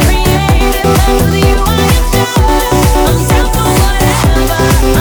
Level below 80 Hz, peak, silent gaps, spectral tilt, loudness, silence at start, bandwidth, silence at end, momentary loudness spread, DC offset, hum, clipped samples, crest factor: -12 dBFS; 0 dBFS; none; -5 dB/octave; -10 LUFS; 0 s; over 20 kHz; 0 s; 1 LU; under 0.1%; none; under 0.1%; 8 dB